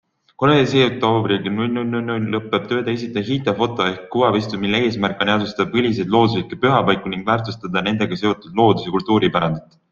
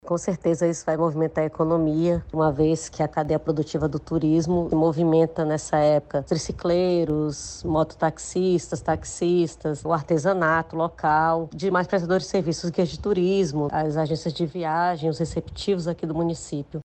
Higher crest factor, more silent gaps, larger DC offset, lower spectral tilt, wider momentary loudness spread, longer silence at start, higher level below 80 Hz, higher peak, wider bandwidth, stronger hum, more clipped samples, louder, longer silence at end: about the same, 16 dB vs 14 dB; neither; neither; about the same, -6.5 dB/octave vs -6.5 dB/octave; about the same, 6 LU vs 6 LU; first, 0.4 s vs 0.05 s; about the same, -52 dBFS vs -48 dBFS; first, -2 dBFS vs -8 dBFS; second, 7.4 kHz vs 9 kHz; neither; neither; first, -19 LUFS vs -24 LUFS; first, 0.3 s vs 0 s